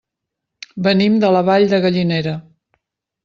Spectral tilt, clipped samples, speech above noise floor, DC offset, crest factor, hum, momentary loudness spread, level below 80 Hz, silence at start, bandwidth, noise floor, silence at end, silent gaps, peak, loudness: -7.5 dB/octave; under 0.1%; 66 dB; under 0.1%; 14 dB; none; 12 LU; -56 dBFS; 0.75 s; 7 kHz; -80 dBFS; 0.85 s; none; -2 dBFS; -15 LUFS